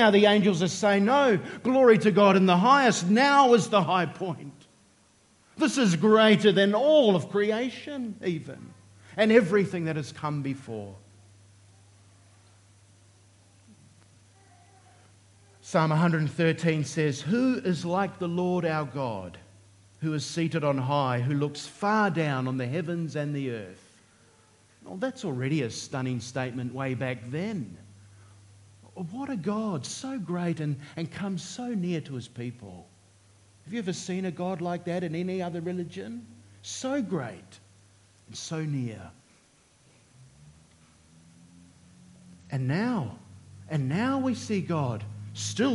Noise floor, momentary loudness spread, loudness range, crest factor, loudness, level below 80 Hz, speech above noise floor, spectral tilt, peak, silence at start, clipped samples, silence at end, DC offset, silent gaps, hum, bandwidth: -62 dBFS; 19 LU; 13 LU; 22 dB; -26 LUFS; -72 dBFS; 36 dB; -5.5 dB/octave; -6 dBFS; 0 s; under 0.1%; 0 s; under 0.1%; none; none; 11.5 kHz